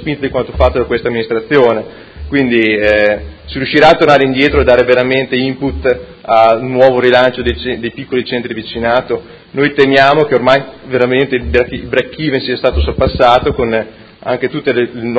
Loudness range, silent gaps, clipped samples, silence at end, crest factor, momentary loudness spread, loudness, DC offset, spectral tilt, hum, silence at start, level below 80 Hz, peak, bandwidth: 3 LU; none; 0.6%; 0 s; 12 dB; 11 LU; -12 LUFS; under 0.1%; -7 dB/octave; none; 0 s; -28 dBFS; 0 dBFS; 8 kHz